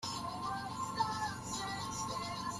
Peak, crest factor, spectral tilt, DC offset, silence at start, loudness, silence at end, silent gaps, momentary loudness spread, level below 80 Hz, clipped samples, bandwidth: -22 dBFS; 18 dB; -3 dB/octave; under 0.1%; 0 s; -39 LUFS; 0 s; none; 4 LU; -62 dBFS; under 0.1%; 15 kHz